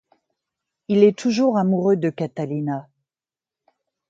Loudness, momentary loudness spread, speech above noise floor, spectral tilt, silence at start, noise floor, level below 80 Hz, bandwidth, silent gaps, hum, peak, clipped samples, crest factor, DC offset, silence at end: -20 LUFS; 11 LU; over 71 dB; -7.5 dB/octave; 0.9 s; under -90 dBFS; -70 dBFS; 7.8 kHz; none; none; -2 dBFS; under 0.1%; 20 dB; under 0.1%; 1.3 s